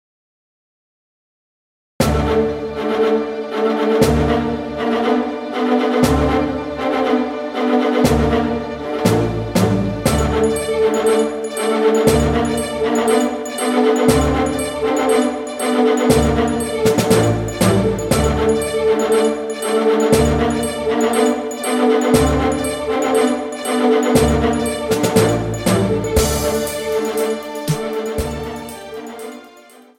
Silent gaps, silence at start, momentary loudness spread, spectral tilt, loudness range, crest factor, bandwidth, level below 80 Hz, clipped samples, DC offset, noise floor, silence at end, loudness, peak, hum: none; 2 s; 8 LU; -5.5 dB/octave; 3 LU; 16 dB; 17 kHz; -32 dBFS; under 0.1%; under 0.1%; -44 dBFS; 0.4 s; -17 LUFS; 0 dBFS; none